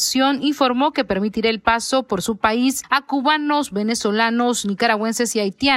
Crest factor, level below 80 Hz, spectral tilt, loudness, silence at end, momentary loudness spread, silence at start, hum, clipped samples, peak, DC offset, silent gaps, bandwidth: 16 dB; -50 dBFS; -3 dB/octave; -19 LUFS; 0 s; 3 LU; 0 s; none; under 0.1%; -2 dBFS; under 0.1%; none; 16 kHz